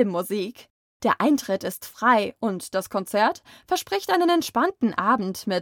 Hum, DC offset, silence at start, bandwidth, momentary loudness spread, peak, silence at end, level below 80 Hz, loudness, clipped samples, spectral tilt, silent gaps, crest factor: none; under 0.1%; 0 s; 19.5 kHz; 8 LU; -8 dBFS; 0 s; -66 dBFS; -24 LUFS; under 0.1%; -4.5 dB/octave; 0.70-1.00 s; 16 dB